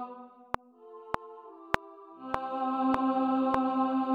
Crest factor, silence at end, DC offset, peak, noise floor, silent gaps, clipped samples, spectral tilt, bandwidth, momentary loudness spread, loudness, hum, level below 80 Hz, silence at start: 28 dB; 0 s; under 0.1%; -2 dBFS; -51 dBFS; none; under 0.1%; -6.5 dB/octave; 7.8 kHz; 21 LU; -31 LUFS; none; -60 dBFS; 0 s